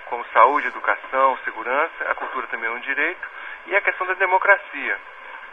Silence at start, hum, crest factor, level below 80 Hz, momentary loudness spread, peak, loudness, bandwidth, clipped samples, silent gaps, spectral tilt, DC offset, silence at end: 0 s; none; 22 dB; -64 dBFS; 13 LU; 0 dBFS; -21 LUFS; 6.8 kHz; under 0.1%; none; -3.5 dB/octave; 0.2%; 0 s